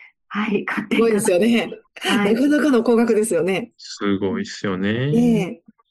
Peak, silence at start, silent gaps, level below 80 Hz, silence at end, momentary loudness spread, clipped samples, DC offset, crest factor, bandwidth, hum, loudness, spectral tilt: -6 dBFS; 0.3 s; none; -60 dBFS; 0.35 s; 9 LU; under 0.1%; under 0.1%; 14 dB; 12.5 kHz; none; -19 LUFS; -5.5 dB/octave